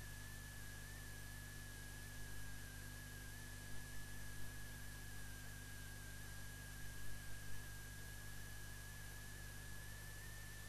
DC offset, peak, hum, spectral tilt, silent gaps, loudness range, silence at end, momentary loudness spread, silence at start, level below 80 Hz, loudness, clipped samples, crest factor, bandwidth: 0.1%; -36 dBFS; 50 Hz at -55 dBFS; -3 dB/octave; none; 0 LU; 0 s; 0 LU; 0 s; -58 dBFS; -54 LUFS; under 0.1%; 16 dB; 13 kHz